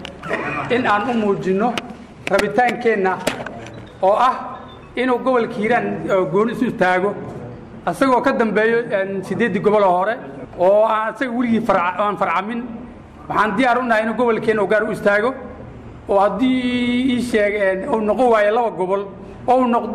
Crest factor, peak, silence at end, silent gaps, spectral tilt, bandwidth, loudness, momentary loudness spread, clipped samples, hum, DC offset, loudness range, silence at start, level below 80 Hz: 12 dB; -6 dBFS; 0 s; none; -6 dB/octave; 14 kHz; -18 LUFS; 15 LU; under 0.1%; none; under 0.1%; 2 LU; 0 s; -48 dBFS